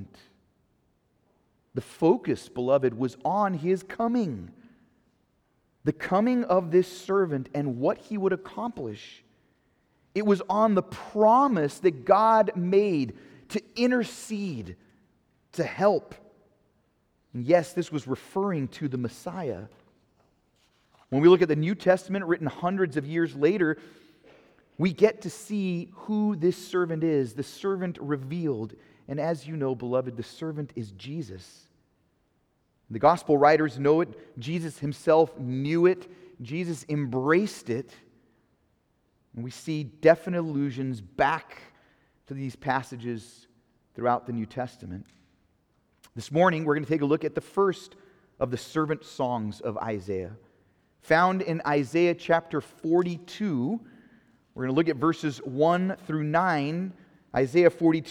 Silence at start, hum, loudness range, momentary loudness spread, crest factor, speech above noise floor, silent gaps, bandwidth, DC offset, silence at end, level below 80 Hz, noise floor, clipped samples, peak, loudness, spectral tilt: 0 s; none; 8 LU; 15 LU; 22 dB; 45 dB; none; 14 kHz; under 0.1%; 0 s; -66 dBFS; -70 dBFS; under 0.1%; -4 dBFS; -26 LUFS; -7 dB/octave